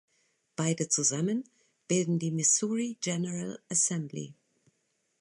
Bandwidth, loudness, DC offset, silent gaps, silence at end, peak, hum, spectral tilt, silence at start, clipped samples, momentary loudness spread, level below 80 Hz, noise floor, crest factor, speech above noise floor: 11.5 kHz; -29 LUFS; under 0.1%; none; 0.9 s; -14 dBFS; none; -4 dB/octave; 0.6 s; under 0.1%; 13 LU; -76 dBFS; -77 dBFS; 18 dB; 47 dB